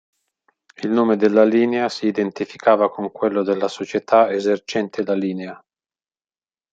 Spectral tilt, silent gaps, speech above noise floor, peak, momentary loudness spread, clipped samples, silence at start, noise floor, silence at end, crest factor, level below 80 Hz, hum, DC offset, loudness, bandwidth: -6 dB/octave; none; over 71 dB; -2 dBFS; 10 LU; under 0.1%; 0.8 s; under -90 dBFS; 1.15 s; 18 dB; -70 dBFS; none; under 0.1%; -19 LUFS; 8 kHz